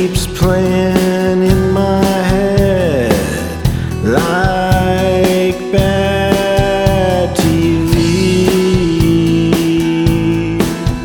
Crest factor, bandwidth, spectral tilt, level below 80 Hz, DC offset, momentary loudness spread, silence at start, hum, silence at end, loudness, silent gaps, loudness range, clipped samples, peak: 12 dB; 19.5 kHz; -6 dB/octave; -24 dBFS; under 0.1%; 3 LU; 0 s; none; 0 s; -13 LUFS; none; 1 LU; under 0.1%; 0 dBFS